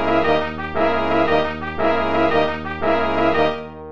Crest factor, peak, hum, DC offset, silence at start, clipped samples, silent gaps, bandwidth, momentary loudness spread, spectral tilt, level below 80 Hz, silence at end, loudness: 14 dB; -6 dBFS; none; 3%; 0 s; under 0.1%; none; 7.4 kHz; 5 LU; -7 dB/octave; -38 dBFS; 0 s; -19 LUFS